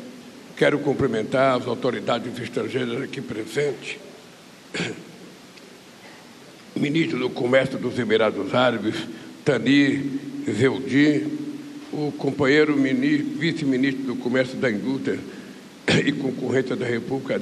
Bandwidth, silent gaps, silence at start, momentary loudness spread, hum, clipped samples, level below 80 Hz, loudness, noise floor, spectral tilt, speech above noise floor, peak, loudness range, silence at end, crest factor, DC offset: 12.5 kHz; none; 0 s; 17 LU; none; under 0.1%; -62 dBFS; -23 LUFS; -46 dBFS; -6 dB/octave; 24 dB; -6 dBFS; 8 LU; 0 s; 18 dB; under 0.1%